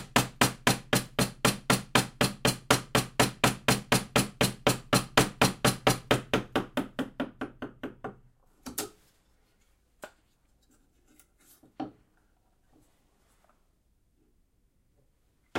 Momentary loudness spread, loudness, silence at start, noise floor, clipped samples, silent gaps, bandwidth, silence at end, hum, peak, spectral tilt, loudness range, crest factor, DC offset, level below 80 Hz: 17 LU; -27 LUFS; 0 s; -69 dBFS; under 0.1%; none; 16.5 kHz; 0 s; none; -4 dBFS; -3.5 dB/octave; 19 LU; 26 dB; under 0.1%; -52 dBFS